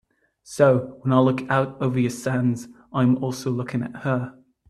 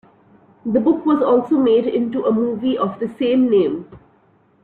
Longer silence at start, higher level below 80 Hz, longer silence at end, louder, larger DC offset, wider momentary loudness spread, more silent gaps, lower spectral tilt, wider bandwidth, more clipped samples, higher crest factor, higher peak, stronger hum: second, 0.5 s vs 0.65 s; about the same, -60 dBFS vs -58 dBFS; second, 0.4 s vs 0.65 s; second, -23 LUFS vs -18 LUFS; neither; first, 10 LU vs 7 LU; neither; second, -7 dB/octave vs -9 dB/octave; first, 13 kHz vs 4.4 kHz; neither; first, 20 dB vs 14 dB; about the same, -2 dBFS vs -4 dBFS; neither